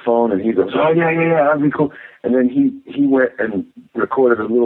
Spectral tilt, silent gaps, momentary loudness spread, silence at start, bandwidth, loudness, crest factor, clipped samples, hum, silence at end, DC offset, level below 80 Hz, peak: -10.5 dB/octave; none; 8 LU; 0.05 s; 4 kHz; -16 LUFS; 14 dB; under 0.1%; none; 0 s; under 0.1%; -58 dBFS; -2 dBFS